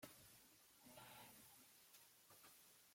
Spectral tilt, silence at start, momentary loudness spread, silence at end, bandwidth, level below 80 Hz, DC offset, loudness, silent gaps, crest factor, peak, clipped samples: -2 dB/octave; 0 s; 6 LU; 0 s; 16.5 kHz; under -90 dBFS; under 0.1%; -65 LUFS; none; 22 dB; -44 dBFS; under 0.1%